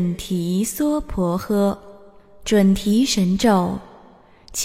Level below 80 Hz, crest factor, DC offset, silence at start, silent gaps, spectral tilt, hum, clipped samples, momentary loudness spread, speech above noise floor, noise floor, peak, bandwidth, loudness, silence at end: -40 dBFS; 16 dB; under 0.1%; 0 s; none; -5.5 dB/octave; none; under 0.1%; 11 LU; 30 dB; -49 dBFS; -4 dBFS; 16 kHz; -20 LUFS; 0 s